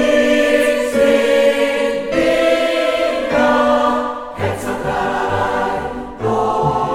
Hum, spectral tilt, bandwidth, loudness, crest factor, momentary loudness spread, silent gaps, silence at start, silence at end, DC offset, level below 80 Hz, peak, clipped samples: none; -5 dB/octave; 16 kHz; -16 LUFS; 14 dB; 8 LU; none; 0 s; 0 s; under 0.1%; -40 dBFS; -2 dBFS; under 0.1%